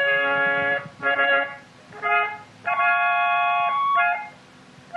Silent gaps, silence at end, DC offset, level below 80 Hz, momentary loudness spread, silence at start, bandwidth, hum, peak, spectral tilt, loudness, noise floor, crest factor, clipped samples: none; 0 s; under 0.1%; -72 dBFS; 10 LU; 0 s; 9 kHz; none; -8 dBFS; -4 dB/octave; -21 LUFS; -48 dBFS; 14 dB; under 0.1%